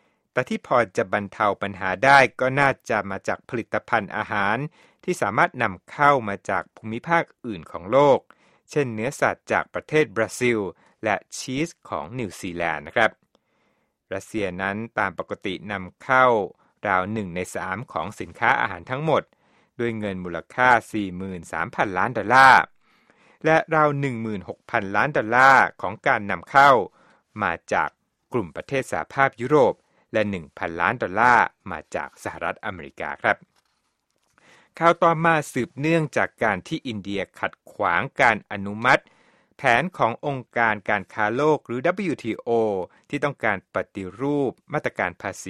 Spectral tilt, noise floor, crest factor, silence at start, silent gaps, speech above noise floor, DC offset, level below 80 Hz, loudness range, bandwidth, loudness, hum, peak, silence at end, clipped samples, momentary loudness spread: -5.5 dB/octave; -72 dBFS; 22 dB; 0.35 s; none; 50 dB; under 0.1%; -58 dBFS; 6 LU; 14.5 kHz; -22 LUFS; none; 0 dBFS; 0 s; under 0.1%; 13 LU